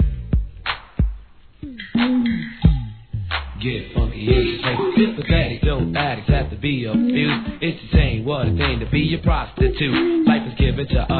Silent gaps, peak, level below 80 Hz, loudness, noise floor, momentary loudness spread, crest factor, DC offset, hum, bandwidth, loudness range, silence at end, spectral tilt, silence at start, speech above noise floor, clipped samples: none; -2 dBFS; -26 dBFS; -20 LUFS; -41 dBFS; 8 LU; 18 dB; 0.2%; none; 4.5 kHz; 3 LU; 0 s; -10 dB/octave; 0 s; 22 dB; under 0.1%